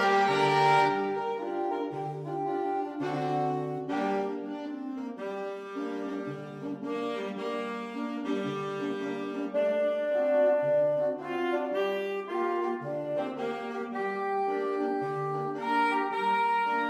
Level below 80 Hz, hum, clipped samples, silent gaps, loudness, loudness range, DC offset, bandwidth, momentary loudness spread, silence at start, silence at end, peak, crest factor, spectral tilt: -78 dBFS; none; under 0.1%; none; -30 LUFS; 7 LU; under 0.1%; 13.5 kHz; 11 LU; 0 s; 0 s; -12 dBFS; 18 dB; -6 dB/octave